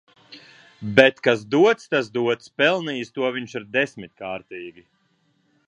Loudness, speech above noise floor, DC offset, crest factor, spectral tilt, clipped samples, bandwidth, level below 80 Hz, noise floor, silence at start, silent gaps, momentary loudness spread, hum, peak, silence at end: -21 LUFS; 44 dB; under 0.1%; 22 dB; -5 dB/octave; under 0.1%; 10 kHz; -64 dBFS; -66 dBFS; 0.3 s; none; 19 LU; none; 0 dBFS; 1 s